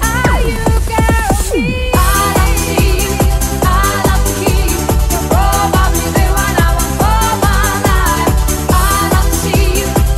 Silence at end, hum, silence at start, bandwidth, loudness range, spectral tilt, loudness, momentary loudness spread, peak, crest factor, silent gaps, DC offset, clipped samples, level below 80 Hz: 0 s; none; 0 s; 16 kHz; 1 LU; -4.5 dB/octave; -12 LUFS; 2 LU; 0 dBFS; 12 dB; none; under 0.1%; under 0.1%; -14 dBFS